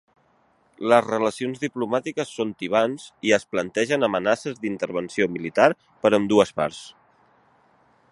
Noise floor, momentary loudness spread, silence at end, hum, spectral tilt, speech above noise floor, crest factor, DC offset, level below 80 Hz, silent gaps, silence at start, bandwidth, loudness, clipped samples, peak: -63 dBFS; 9 LU; 1.2 s; none; -5 dB/octave; 40 dB; 24 dB; under 0.1%; -64 dBFS; none; 0.8 s; 11.5 kHz; -23 LUFS; under 0.1%; 0 dBFS